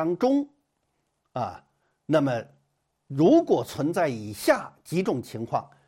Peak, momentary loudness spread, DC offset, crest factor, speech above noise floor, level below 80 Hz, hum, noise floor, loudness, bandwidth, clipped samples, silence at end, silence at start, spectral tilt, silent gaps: -6 dBFS; 13 LU; under 0.1%; 20 dB; 50 dB; -66 dBFS; none; -75 dBFS; -25 LUFS; 16.5 kHz; under 0.1%; 0.2 s; 0 s; -6.5 dB/octave; none